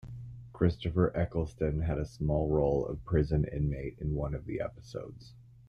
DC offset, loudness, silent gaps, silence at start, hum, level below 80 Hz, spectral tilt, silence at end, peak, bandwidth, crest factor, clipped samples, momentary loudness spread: under 0.1%; -32 LUFS; none; 0.05 s; none; -42 dBFS; -9 dB/octave; 0.25 s; -12 dBFS; 6.8 kHz; 20 dB; under 0.1%; 14 LU